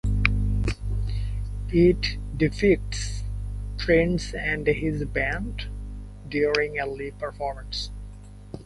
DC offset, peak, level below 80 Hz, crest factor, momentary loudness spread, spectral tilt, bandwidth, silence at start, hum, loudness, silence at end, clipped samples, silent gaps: under 0.1%; -2 dBFS; -32 dBFS; 24 dB; 15 LU; -6 dB/octave; 11.5 kHz; 0.05 s; 50 Hz at -35 dBFS; -26 LUFS; 0 s; under 0.1%; none